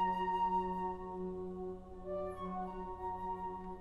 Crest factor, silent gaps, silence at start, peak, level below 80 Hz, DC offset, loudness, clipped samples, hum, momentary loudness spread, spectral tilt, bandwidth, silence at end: 14 dB; none; 0 s; -26 dBFS; -56 dBFS; under 0.1%; -40 LUFS; under 0.1%; none; 10 LU; -8 dB/octave; 11.5 kHz; 0 s